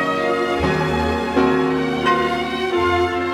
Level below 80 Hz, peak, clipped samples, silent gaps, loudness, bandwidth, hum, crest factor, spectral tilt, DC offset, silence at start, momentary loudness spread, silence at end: -38 dBFS; -4 dBFS; under 0.1%; none; -19 LUFS; 14 kHz; none; 14 dB; -6 dB/octave; under 0.1%; 0 s; 3 LU; 0 s